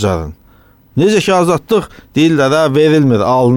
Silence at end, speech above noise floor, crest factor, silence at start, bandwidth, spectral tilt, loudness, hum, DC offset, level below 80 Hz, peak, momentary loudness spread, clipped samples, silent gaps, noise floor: 0 s; 35 dB; 10 dB; 0 s; 17 kHz; -6 dB/octave; -12 LUFS; none; under 0.1%; -38 dBFS; -2 dBFS; 10 LU; under 0.1%; none; -46 dBFS